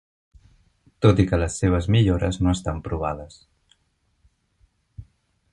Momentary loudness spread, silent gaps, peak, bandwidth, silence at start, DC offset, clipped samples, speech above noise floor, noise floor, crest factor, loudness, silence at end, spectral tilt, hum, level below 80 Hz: 10 LU; none; -2 dBFS; 11 kHz; 1 s; under 0.1%; under 0.1%; 48 dB; -68 dBFS; 22 dB; -22 LUFS; 0.5 s; -6.5 dB/octave; none; -36 dBFS